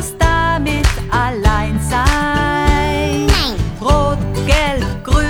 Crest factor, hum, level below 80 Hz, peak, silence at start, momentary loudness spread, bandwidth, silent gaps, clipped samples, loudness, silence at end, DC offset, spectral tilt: 14 dB; none; -18 dBFS; -2 dBFS; 0 s; 3 LU; 17.5 kHz; none; under 0.1%; -15 LUFS; 0 s; under 0.1%; -5 dB/octave